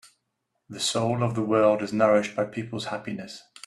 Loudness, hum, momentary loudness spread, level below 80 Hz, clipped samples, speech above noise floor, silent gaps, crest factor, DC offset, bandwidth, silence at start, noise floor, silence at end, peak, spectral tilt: -25 LUFS; none; 14 LU; -66 dBFS; under 0.1%; 53 dB; none; 18 dB; under 0.1%; 13 kHz; 0.7 s; -78 dBFS; 0.25 s; -8 dBFS; -5 dB/octave